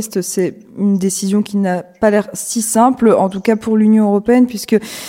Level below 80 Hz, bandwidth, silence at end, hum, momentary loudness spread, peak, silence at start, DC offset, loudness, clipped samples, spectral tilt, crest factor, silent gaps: -52 dBFS; 16.5 kHz; 0 s; none; 8 LU; 0 dBFS; 0 s; under 0.1%; -14 LUFS; under 0.1%; -5.5 dB/octave; 14 dB; none